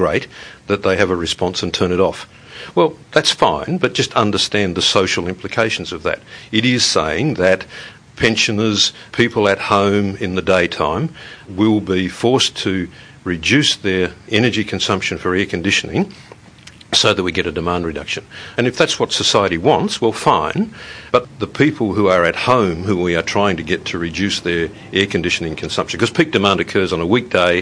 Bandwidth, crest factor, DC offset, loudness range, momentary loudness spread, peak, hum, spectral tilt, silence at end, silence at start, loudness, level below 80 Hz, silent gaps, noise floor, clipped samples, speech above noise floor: 10.5 kHz; 18 dB; under 0.1%; 2 LU; 8 LU; 0 dBFS; none; -4 dB/octave; 0 s; 0 s; -16 LUFS; -44 dBFS; none; -41 dBFS; under 0.1%; 24 dB